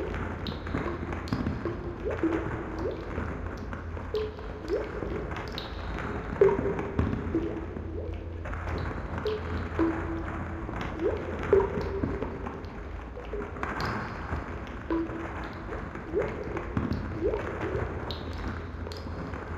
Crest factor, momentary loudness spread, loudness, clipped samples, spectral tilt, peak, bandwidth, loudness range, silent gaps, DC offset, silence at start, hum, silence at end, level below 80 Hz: 24 dB; 8 LU; -33 LUFS; under 0.1%; -7.5 dB/octave; -8 dBFS; 8 kHz; 4 LU; none; under 0.1%; 0 s; none; 0 s; -40 dBFS